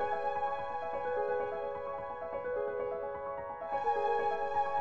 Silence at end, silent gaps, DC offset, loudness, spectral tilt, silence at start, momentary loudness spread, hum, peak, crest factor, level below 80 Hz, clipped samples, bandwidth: 0 s; none; under 0.1%; -36 LUFS; -5.5 dB/octave; 0 s; 8 LU; none; -22 dBFS; 14 dB; -64 dBFS; under 0.1%; 7.2 kHz